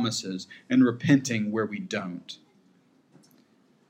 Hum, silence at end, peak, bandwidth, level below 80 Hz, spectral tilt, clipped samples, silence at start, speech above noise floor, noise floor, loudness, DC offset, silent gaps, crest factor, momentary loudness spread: none; 1.55 s; -8 dBFS; 14.5 kHz; -80 dBFS; -5 dB/octave; under 0.1%; 0 s; 36 dB; -63 dBFS; -26 LUFS; under 0.1%; none; 20 dB; 17 LU